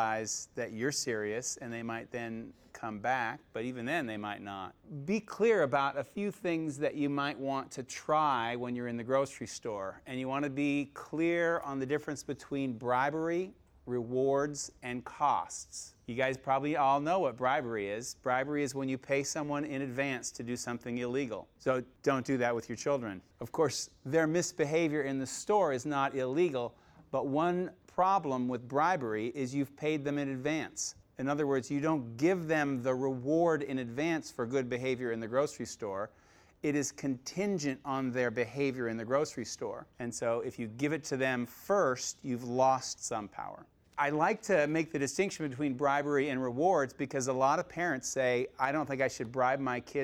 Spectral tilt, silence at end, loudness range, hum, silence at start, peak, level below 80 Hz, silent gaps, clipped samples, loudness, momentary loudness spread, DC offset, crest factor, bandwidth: -4.5 dB/octave; 0 s; 4 LU; none; 0 s; -16 dBFS; -70 dBFS; none; under 0.1%; -33 LUFS; 10 LU; under 0.1%; 18 dB; 17 kHz